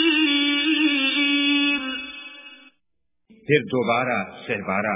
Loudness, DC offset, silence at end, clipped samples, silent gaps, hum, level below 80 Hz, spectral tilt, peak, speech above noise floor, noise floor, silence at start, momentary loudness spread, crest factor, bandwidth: -20 LUFS; under 0.1%; 0 s; under 0.1%; none; none; -62 dBFS; -1.5 dB/octave; -4 dBFS; 57 dB; -79 dBFS; 0 s; 17 LU; 18 dB; 3.9 kHz